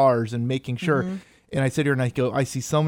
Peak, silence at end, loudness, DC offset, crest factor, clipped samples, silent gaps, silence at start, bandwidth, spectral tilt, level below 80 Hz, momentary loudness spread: -8 dBFS; 0 s; -24 LUFS; under 0.1%; 16 dB; under 0.1%; none; 0 s; 16.5 kHz; -6 dB/octave; -56 dBFS; 7 LU